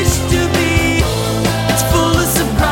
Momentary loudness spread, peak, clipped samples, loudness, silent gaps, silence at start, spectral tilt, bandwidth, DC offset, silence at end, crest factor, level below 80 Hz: 3 LU; 0 dBFS; under 0.1%; -14 LUFS; none; 0 s; -4.5 dB/octave; 17 kHz; under 0.1%; 0 s; 14 dB; -22 dBFS